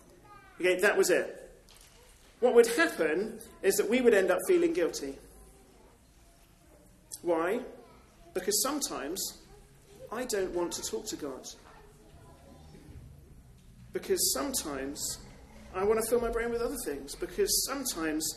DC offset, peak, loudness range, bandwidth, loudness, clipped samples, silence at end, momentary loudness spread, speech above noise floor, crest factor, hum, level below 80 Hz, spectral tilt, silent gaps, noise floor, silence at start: under 0.1%; -10 dBFS; 11 LU; 13 kHz; -30 LUFS; under 0.1%; 0 s; 17 LU; 30 dB; 22 dB; none; -56 dBFS; -2.5 dB/octave; none; -59 dBFS; 0.3 s